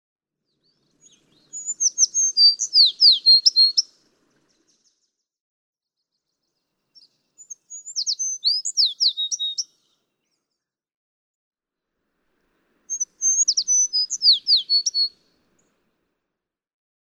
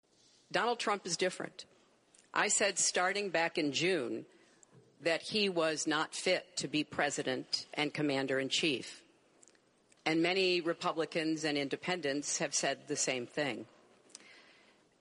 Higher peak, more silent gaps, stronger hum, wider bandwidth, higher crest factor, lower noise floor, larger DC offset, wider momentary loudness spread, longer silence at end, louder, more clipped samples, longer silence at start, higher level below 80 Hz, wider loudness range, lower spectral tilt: first, -2 dBFS vs -14 dBFS; first, 5.41-5.73 s, 10.96-11.51 s vs none; neither; first, 12.5 kHz vs 11 kHz; about the same, 20 dB vs 22 dB; first, -84 dBFS vs -68 dBFS; neither; first, 18 LU vs 9 LU; first, 1.95 s vs 0.65 s; first, -16 LUFS vs -33 LUFS; neither; first, 1.55 s vs 0.5 s; about the same, -84 dBFS vs -80 dBFS; first, 16 LU vs 3 LU; second, 5.5 dB/octave vs -2.5 dB/octave